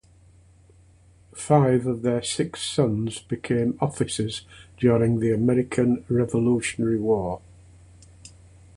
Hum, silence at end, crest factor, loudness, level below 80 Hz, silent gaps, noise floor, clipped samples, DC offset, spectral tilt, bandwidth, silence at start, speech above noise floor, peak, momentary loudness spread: none; 0.5 s; 20 dB; -23 LUFS; -52 dBFS; none; -54 dBFS; under 0.1%; under 0.1%; -6 dB/octave; 11.5 kHz; 1.35 s; 31 dB; -4 dBFS; 10 LU